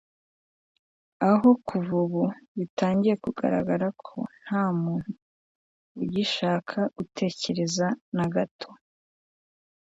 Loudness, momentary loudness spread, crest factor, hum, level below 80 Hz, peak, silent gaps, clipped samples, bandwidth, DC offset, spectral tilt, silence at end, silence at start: -27 LUFS; 12 LU; 20 dB; none; -64 dBFS; -8 dBFS; 2.48-2.55 s, 2.70-2.77 s, 5.22-5.95 s, 8.01-8.12 s, 8.51-8.59 s; under 0.1%; 7.8 kHz; under 0.1%; -6 dB/octave; 1.2 s; 1.2 s